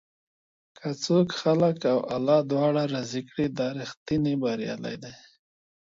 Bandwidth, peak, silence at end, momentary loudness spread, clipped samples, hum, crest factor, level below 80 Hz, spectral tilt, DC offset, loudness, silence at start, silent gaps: 7.8 kHz; -10 dBFS; 0.75 s; 13 LU; under 0.1%; none; 18 dB; -62 dBFS; -6.5 dB/octave; under 0.1%; -26 LUFS; 0.8 s; 3.97-4.06 s